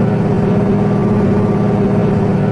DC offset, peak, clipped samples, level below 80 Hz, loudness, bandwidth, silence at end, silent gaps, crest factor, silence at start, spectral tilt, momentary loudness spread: under 0.1%; -2 dBFS; under 0.1%; -32 dBFS; -14 LUFS; 7.6 kHz; 0 s; none; 10 dB; 0 s; -10 dB/octave; 1 LU